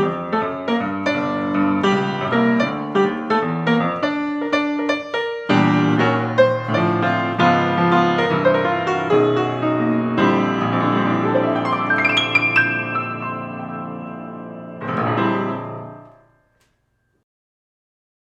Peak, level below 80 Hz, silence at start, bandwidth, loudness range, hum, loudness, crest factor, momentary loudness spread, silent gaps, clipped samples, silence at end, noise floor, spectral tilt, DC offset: -2 dBFS; -62 dBFS; 0 s; 8.2 kHz; 9 LU; none; -19 LUFS; 18 dB; 12 LU; none; under 0.1%; 2.25 s; -66 dBFS; -6.5 dB/octave; under 0.1%